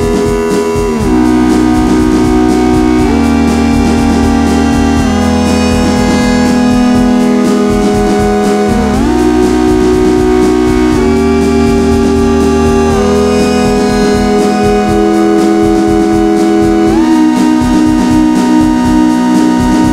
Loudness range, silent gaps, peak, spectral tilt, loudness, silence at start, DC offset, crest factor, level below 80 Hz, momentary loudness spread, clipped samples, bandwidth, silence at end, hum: 1 LU; none; 0 dBFS; -6 dB/octave; -9 LUFS; 0 s; under 0.1%; 8 dB; -22 dBFS; 1 LU; under 0.1%; 15 kHz; 0 s; none